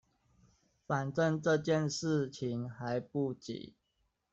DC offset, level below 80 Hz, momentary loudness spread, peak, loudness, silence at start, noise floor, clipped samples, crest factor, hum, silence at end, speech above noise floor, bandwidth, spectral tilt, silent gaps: under 0.1%; -72 dBFS; 13 LU; -18 dBFS; -34 LUFS; 0.9 s; -80 dBFS; under 0.1%; 18 dB; none; 0.65 s; 46 dB; 8.2 kHz; -6 dB/octave; none